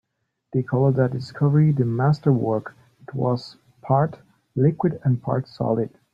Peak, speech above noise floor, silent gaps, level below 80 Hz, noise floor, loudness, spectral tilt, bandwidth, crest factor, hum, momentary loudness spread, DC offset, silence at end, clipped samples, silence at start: -6 dBFS; 41 dB; none; -58 dBFS; -62 dBFS; -22 LUFS; -10 dB/octave; 5.6 kHz; 16 dB; none; 9 LU; under 0.1%; 0.25 s; under 0.1%; 0.55 s